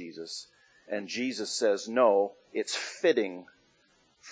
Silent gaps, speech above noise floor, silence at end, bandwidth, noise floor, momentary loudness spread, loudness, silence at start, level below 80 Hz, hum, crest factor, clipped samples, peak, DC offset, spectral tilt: none; 38 dB; 0 s; 8 kHz; -67 dBFS; 15 LU; -29 LUFS; 0 s; -84 dBFS; none; 20 dB; under 0.1%; -10 dBFS; under 0.1%; -2.5 dB/octave